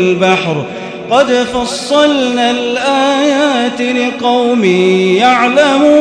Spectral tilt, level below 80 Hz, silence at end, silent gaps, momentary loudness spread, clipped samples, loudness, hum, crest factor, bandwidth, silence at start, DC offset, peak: -4.5 dB/octave; -48 dBFS; 0 s; none; 6 LU; 0.2%; -11 LUFS; none; 10 dB; 10.5 kHz; 0 s; under 0.1%; 0 dBFS